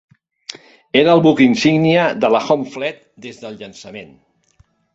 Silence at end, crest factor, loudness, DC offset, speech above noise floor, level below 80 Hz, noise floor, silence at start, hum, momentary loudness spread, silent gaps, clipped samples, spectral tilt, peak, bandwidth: 0.9 s; 16 dB; -14 LUFS; under 0.1%; 41 dB; -56 dBFS; -56 dBFS; 0.95 s; none; 23 LU; none; under 0.1%; -6 dB/octave; -2 dBFS; 8 kHz